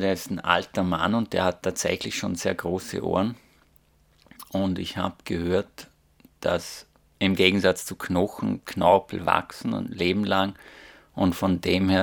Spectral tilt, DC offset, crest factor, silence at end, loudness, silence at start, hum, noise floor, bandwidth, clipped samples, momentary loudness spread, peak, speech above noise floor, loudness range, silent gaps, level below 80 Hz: -5 dB/octave; under 0.1%; 24 dB; 0 s; -25 LUFS; 0 s; none; -61 dBFS; over 20 kHz; under 0.1%; 10 LU; 0 dBFS; 36 dB; 6 LU; none; -58 dBFS